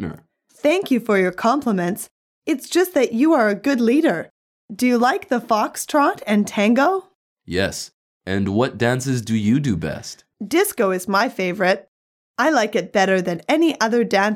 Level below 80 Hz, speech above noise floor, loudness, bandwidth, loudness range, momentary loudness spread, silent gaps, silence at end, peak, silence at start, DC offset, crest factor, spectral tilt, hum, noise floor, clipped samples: -56 dBFS; 29 dB; -19 LUFS; 17 kHz; 2 LU; 11 LU; 2.11-2.42 s, 4.30-4.69 s, 7.15-7.36 s, 7.93-8.21 s, 11.88-12.34 s; 0 s; -2 dBFS; 0 s; under 0.1%; 16 dB; -5 dB/octave; none; -47 dBFS; under 0.1%